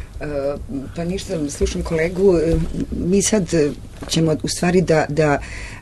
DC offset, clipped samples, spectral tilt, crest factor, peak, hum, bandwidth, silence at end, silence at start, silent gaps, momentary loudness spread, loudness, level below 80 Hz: under 0.1%; under 0.1%; -5 dB/octave; 16 dB; -4 dBFS; none; 12.5 kHz; 0 s; 0 s; none; 10 LU; -19 LUFS; -32 dBFS